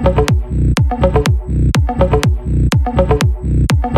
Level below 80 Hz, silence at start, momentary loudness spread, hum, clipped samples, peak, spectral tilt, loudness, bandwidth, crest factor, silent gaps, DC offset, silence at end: -18 dBFS; 0 s; 3 LU; none; under 0.1%; -2 dBFS; -6.5 dB/octave; -14 LUFS; 13.5 kHz; 12 dB; none; under 0.1%; 0 s